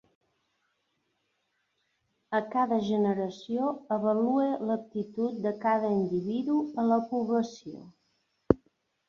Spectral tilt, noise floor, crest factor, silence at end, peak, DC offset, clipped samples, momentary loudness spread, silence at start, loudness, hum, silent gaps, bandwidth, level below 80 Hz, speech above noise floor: -7.5 dB/octave; -77 dBFS; 26 dB; 0.55 s; -4 dBFS; under 0.1%; under 0.1%; 6 LU; 2.3 s; -29 LUFS; none; none; 7 kHz; -60 dBFS; 49 dB